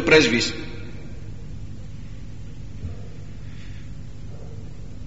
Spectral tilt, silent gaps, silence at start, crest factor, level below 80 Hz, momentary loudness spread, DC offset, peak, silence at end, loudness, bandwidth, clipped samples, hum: -3 dB/octave; none; 0 s; 24 dB; -40 dBFS; 19 LU; 2%; -2 dBFS; 0 s; -21 LUFS; 8 kHz; under 0.1%; none